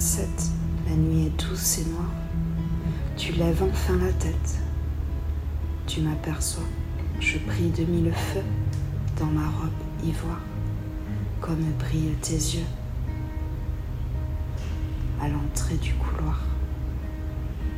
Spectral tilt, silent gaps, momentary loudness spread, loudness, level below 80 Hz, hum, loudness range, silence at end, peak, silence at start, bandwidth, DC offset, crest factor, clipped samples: -5.5 dB/octave; none; 8 LU; -28 LUFS; -30 dBFS; none; 3 LU; 0 s; -10 dBFS; 0 s; 15.5 kHz; under 0.1%; 16 dB; under 0.1%